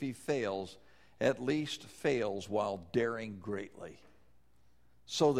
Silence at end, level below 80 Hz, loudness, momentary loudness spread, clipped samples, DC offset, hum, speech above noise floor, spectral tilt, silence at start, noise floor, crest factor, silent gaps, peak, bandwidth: 0 s; -68 dBFS; -35 LUFS; 10 LU; under 0.1%; under 0.1%; none; 35 dB; -5 dB/octave; 0 s; -70 dBFS; 20 dB; none; -16 dBFS; 15 kHz